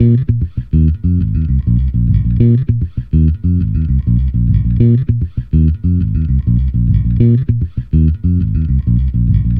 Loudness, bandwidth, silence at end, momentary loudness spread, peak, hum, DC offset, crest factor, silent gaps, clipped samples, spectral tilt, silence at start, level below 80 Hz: -14 LUFS; 3.4 kHz; 0 s; 5 LU; 0 dBFS; none; under 0.1%; 12 dB; none; under 0.1%; -13 dB/octave; 0 s; -18 dBFS